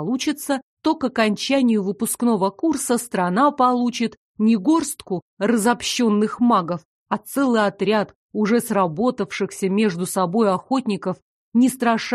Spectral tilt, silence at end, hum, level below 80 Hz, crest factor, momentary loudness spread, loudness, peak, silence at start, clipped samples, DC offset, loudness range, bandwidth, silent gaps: -5 dB/octave; 0 s; none; -62 dBFS; 16 dB; 8 LU; -21 LUFS; -4 dBFS; 0 s; under 0.1%; under 0.1%; 2 LU; 13 kHz; 0.63-0.77 s, 4.17-4.35 s, 5.22-5.37 s, 6.85-7.06 s, 8.15-8.29 s, 11.22-11.52 s